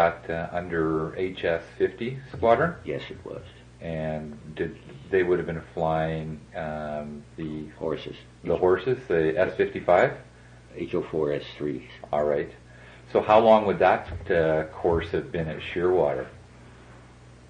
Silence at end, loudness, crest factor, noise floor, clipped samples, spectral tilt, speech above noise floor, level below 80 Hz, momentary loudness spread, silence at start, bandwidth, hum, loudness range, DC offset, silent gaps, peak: 0 s; -26 LUFS; 20 dB; -49 dBFS; under 0.1%; -7.5 dB/octave; 24 dB; -52 dBFS; 16 LU; 0 s; 9.6 kHz; none; 6 LU; under 0.1%; none; -6 dBFS